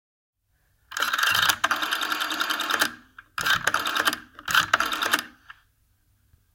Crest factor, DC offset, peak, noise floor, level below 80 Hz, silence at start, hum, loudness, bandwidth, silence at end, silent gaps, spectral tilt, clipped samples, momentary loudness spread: 26 dB; under 0.1%; -2 dBFS; -68 dBFS; -60 dBFS; 0.9 s; none; -23 LUFS; 17 kHz; 1.05 s; none; 0 dB/octave; under 0.1%; 8 LU